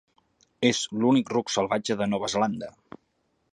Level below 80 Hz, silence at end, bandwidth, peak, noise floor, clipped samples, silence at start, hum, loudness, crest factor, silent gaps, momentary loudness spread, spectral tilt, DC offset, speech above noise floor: -64 dBFS; 0.8 s; 10.5 kHz; -8 dBFS; -72 dBFS; under 0.1%; 0.6 s; none; -25 LUFS; 20 dB; none; 5 LU; -4.5 dB/octave; under 0.1%; 47 dB